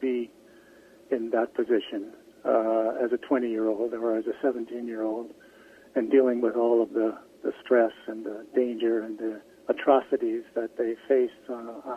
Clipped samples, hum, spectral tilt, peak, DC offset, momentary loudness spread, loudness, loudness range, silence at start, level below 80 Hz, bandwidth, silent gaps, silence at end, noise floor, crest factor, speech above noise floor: under 0.1%; none; -6.5 dB/octave; -8 dBFS; under 0.1%; 13 LU; -27 LUFS; 3 LU; 0 s; -74 dBFS; 6.6 kHz; none; 0 s; -54 dBFS; 20 dB; 27 dB